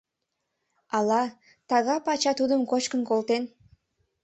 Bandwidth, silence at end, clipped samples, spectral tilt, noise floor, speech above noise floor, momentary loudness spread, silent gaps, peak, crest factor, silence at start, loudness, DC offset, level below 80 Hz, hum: 8.2 kHz; 0.75 s; under 0.1%; -3.5 dB/octave; -82 dBFS; 57 dB; 5 LU; none; -10 dBFS; 18 dB; 0.9 s; -26 LUFS; under 0.1%; -72 dBFS; none